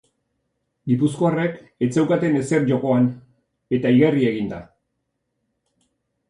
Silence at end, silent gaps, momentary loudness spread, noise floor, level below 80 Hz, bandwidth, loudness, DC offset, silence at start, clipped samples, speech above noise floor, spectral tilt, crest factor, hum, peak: 1.65 s; none; 11 LU; -75 dBFS; -60 dBFS; 11 kHz; -20 LUFS; under 0.1%; 0.85 s; under 0.1%; 56 dB; -7.5 dB/octave; 18 dB; none; -4 dBFS